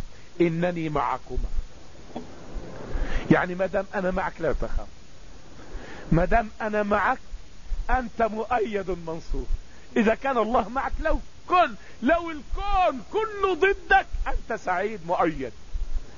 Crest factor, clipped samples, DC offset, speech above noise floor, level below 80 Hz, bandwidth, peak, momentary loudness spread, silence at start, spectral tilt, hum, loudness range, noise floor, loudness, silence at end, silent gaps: 22 dB; under 0.1%; 1%; 23 dB; -32 dBFS; 7.4 kHz; -4 dBFS; 18 LU; 0 s; -6.5 dB/octave; none; 4 LU; -47 dBFS; -26 LUFS; 0 s; none